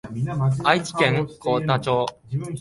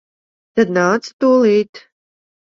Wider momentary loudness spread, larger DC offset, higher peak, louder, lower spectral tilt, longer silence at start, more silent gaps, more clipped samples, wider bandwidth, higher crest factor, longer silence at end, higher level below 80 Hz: about the same, 8 LU vs 8 LU; neither; about the same, -2 dBFS vs -2 dBFS; second, -22 LUFS vs -15 LUFS; about the same, -6 dB/octave vs -6 dB/octave; second, 0.05 s vs 0.55 s; second, none vs 1.13-1.19 s, 1.69-1.73 s; neither; first, 11.5 kHz vs 7.6 kHz; first, 22 dB vs 16 dB; second, 0 s vs 0.75 s; first, -54 dBFS vs -62 dBFS